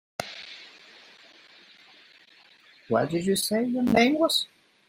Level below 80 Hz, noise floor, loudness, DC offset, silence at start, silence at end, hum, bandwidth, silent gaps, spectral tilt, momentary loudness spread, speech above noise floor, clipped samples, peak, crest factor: -62 dBFS; -56 dBFS; -25 LUFS; under 0.1%; 0.2 s; 0.45 s; none; 16 kHz; none; -4 dB/octave; 20 LU; 33 dB; under 0.1%; -8 dBFS; 20 dB